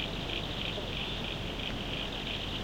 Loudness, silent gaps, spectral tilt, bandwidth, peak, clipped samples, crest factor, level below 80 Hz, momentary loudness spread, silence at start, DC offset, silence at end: -35 LUFS; none; -4.5 dB/octave; 16.5 kHz; -20 dBFS; under 0.1%; 16 dB; -44 dBFS; 1 LU; 0 s; 0.1%; 0 s